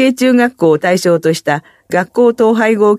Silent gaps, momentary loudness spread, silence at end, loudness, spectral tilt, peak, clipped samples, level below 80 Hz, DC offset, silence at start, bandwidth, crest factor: none; 7 LU; 0 s; -12 LUFS; -5.5 dB/octave; 0 dBFS; under 0.1%; -60 dBFS; under 0.1%; 0 s; 14.5 kHz; 12 dB